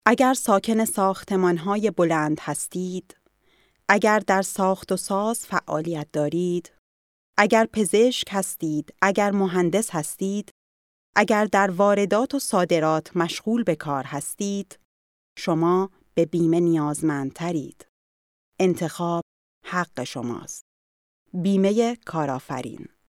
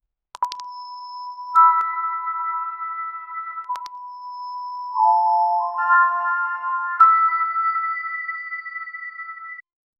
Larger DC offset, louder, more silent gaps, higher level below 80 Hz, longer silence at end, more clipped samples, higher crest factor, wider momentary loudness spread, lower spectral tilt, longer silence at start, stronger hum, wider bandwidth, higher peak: neither; second, -23 LUFS vs -20 LUFS; first, 6.78-7.33 s, 10.51-11.13 s, 14.85-15.36 s, 17.89-18.52 s, 19.22-19.61 s, 20.61-21.26 s vs none; first, -66 dBFS vs -82 dBFS; second, 0.25 s vs 0.4 s; neither; about the same, 22 dB vs 18 dB; second, 11 LU vs 19 LU; first, -5 dB/octave vs 0.5 dB/octave; second, 0.05 s vs 0.4 s; neither; first, 16.5 kHz vs 7.6 kHz; first, 0 dBFS vs -4 dBFS